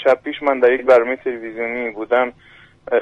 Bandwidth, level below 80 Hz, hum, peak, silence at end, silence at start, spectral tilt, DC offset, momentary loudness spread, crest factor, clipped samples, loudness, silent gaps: 7.2 kHz; -56 dBFS; none; -2 dBFS; 0 s; 0 s; -5.5 dB/octave; under 0.1%; 11 LU; 14 dB; under 0.1%; -18 LUFS; none